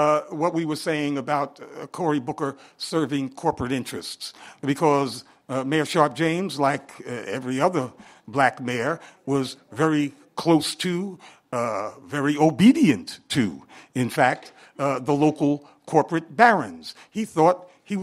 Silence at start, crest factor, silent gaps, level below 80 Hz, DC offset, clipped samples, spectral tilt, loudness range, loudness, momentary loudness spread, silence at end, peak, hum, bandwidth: 0 s; 22 dB; none; -62 dBFS; under 0.1%; under 0.1%; -5.5 dB/octave; 4 LU; -24 LUFS; 13 LU; 0 s; 0 dBFS; none; 15.5 kHz